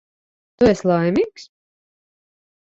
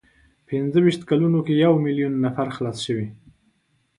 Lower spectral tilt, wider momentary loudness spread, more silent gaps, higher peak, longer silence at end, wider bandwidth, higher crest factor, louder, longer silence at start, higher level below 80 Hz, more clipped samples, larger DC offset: about the same, -7 dB/octave vs -7.5 dB/octave; second, 6 LU vs 10 LU; neither; about the same, -4 dBFS vs -6 dBFS; first, 1.35 s vs 0.85 s; second, 8 kHz vs 11.5 kHz; about the same, 18 dB vs 16 dB; first, -18 LUFS vs -21 LUFS; about the same, 0.6 s vs 0.5 s; first, -48 dBFS vs -60 dBFS; neither; neither